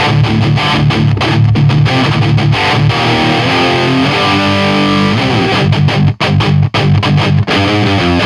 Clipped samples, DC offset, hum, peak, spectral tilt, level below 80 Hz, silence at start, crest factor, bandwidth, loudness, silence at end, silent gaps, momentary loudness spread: under 0.1%; under 0.1%; none; 0 dBFS; -6.5 dB/octave; -32 dBFS; 0 s; 10 dB; 11 kHz; -10 LUFS; 0 s; none; 1 LU